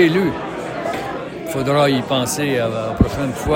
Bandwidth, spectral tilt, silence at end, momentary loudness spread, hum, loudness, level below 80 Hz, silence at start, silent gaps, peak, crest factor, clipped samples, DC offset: 17 kHz; -5.5 dB/octave; 0 s; 10 LU; none; -19 LUFS; -34 dBFS; 0 s; none; -2 dBFS; 18 dB; under 0.1%; under 0.1%